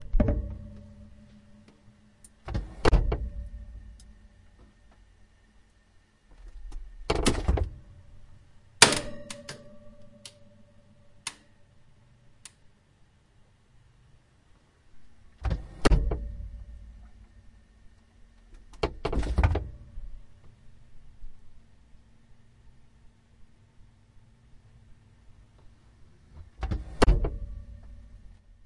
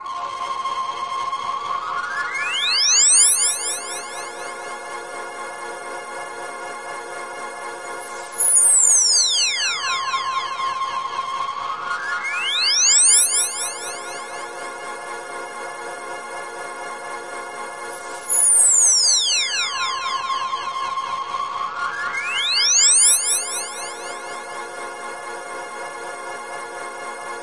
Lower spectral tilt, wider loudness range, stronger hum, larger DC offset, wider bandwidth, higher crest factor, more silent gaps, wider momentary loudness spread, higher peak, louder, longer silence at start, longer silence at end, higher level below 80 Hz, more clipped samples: first, -3.5 dB/octave vs 2.5 dB/octave; first, 21 LU vs 15 LU; neither; second, under 0.1% vs 0.3%; about the same, 11.5 kHz vs 11.5 kHz; first, 32 dB vs 18 dB; neither; first, 26 LU vs 20 LU; about the same, 0 dBFS vs -2 dBFS; second, -28 LUFS vs -16 LUFS; about the same, 0 s vs 0 s; first, 0.5 s vs 0 s; first, -36 dBFS vs -70 dBFS; neither